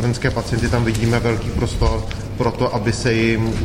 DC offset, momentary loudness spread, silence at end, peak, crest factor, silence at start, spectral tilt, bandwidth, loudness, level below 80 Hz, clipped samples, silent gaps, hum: under 0.1%; 5 LU; 0 s; -4 dBFS; 14 dB; 0 s; -6 dB/octave; 14 kHz; -19 LUFS; -28 dBFS; under 0.1%; none; none